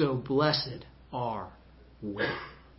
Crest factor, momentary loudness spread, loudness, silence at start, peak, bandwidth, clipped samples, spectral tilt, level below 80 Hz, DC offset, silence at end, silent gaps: 20 dB; 16 LU; -31 LUFS; 0 s; -12 dBFS; 5.8 kHz; under 0.1%; -9 dB/octave; -56 dBFS; under 0.1%; 0.1 s; none